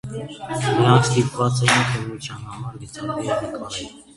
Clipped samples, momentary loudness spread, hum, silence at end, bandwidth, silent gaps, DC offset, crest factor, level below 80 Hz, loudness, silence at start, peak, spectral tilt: under 0.1%; 17 LU; none; 0.15 s; 11.5 kHz; none; under 0.1%; 22 dB; -50 dBFS; -20 LUFS; 0.05 s; 0 dBFS; -5 dB/octave